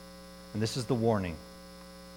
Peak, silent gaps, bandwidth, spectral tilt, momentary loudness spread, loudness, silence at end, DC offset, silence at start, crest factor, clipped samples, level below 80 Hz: -14 dBFS; none; 17 kHz; -6 dB/octave; 20 LU; -32 LUFS; 0 s; under 0.1%; 0 s; 20 dB; under 0.1%; -56 dBFS